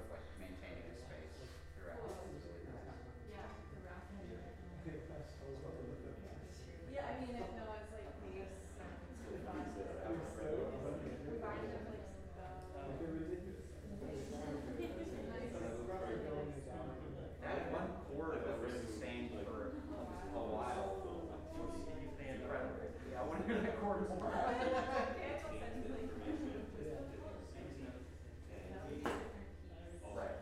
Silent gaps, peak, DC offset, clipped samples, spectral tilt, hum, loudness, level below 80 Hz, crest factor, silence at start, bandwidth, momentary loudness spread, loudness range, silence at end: none; -24 dBFS; under 0.1%; under 0.1%; -6.5 dB/octave; none; -46 LUFS; -56 dBFS; 22 dB; 0 s; 15 kHz; 12 LU; 11 LU; 0 s